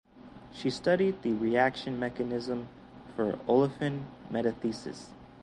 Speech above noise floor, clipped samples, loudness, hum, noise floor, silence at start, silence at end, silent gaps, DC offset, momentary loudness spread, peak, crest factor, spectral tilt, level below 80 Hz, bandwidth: 21 dB; under 0.1%; -31 LUFS; none; -51 dBFS; 0.15 s; 0 s; none; under 0.1%; 19 LU; -12 dBFS; 20 dB; -6.5 dB/octave; -62 dBFS; 11.5 kHz